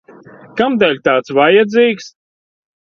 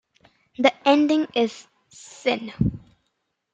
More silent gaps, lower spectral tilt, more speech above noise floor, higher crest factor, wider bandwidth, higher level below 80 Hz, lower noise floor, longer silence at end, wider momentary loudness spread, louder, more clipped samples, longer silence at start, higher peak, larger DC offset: neither; about the same, -5.5 dB/octave vs -6 dB/octave; second, 27 dB vs 55 dB; second, 14 dB vs 22 dB; second, 7 kHz vs 8.8 kHz; second, -58 dBFS vs -46 dBFS; second, -39 dBFS vs -75 dBFS; about the same, 0.8 s vs 0.75 s; second, 10 LU vs 25 LU; first, -13 LUFS vs -22 LUFS; neither; about the same, 0.55 s vs 0.6 s; first, 0 dBFS vs -4 dBFS; neither